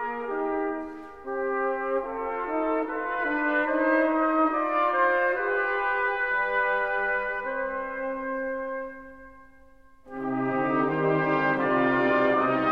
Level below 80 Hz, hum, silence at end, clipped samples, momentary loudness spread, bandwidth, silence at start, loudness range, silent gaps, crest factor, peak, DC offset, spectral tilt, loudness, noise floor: -58 dBFS; none; 0 s; under 0.1%; 9 LU; 6 kHz; 0 s; 7 LU; none; 16 dB; -10 dBFS; 0.2%; -8 dB/octave; -26 LUFS; -56 dBFS